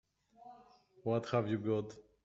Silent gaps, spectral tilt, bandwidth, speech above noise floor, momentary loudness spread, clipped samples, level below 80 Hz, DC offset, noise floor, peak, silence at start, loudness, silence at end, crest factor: none; -7 dB/octave; 7.8 kHz; 28 dB; 23 LU; under 0.1%; -74 dBFS; under 0.1%; -64 dBFS; -20 dBFS; 0.4 s; -37 LUFS; 0.25 s; 18 dB